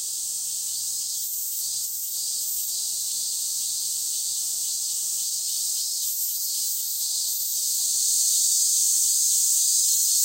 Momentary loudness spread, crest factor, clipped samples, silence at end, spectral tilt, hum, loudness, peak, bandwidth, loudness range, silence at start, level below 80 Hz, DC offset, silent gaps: 8 LU; 16 dB; under 0.1%; 0 s; 4.5 dB/octave; none; -22 LUFS; -8 dBFS; 16 kHz; 6 LU; 0 s; -78 dBFS; under 0.1%; none